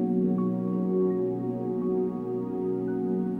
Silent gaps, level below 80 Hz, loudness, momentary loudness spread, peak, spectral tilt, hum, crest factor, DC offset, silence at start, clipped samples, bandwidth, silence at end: none; -64 dBFS; -28 LUFS; 5 LU; -14 dBFS; -12 dB/octave; none; 12 dB; under 0.1%; 0 s; under 0.1%; 3 kHz; 0 s